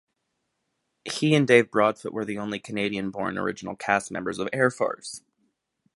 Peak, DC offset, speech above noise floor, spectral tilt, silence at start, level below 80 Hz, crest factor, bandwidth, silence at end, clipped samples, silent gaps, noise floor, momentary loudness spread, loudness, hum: -2 dBFS; under 0.1%; 53 dB; -5 dB/octave; 1.05 s; -64 dBFS; 24 dB; 11.5 kHz; 0.8 s; under 0.1%; none; -78 dBFS; 15 LU; -25 LUFS; none